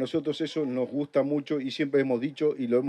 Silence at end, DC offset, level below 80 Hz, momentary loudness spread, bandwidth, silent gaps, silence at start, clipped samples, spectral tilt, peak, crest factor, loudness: 0 s; under 0.1%; -78 dBFS; 4 LU; 9.4 kHz; none; 0 s; under 0.1%; -7 dB/octave; -12 dBFS; 14 dB; -28 LUFS